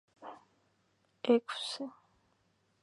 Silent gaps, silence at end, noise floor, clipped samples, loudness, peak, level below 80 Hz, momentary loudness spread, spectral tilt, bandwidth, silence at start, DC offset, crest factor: none; 0.95 s; -74 dBFS; under 0.1%; -33 LUFS; -14 dBFS; -86 dBFS; 22 LU; -4 dB/octave; 11.5 kHz; 0.2 s; under 0.1%; 24 dB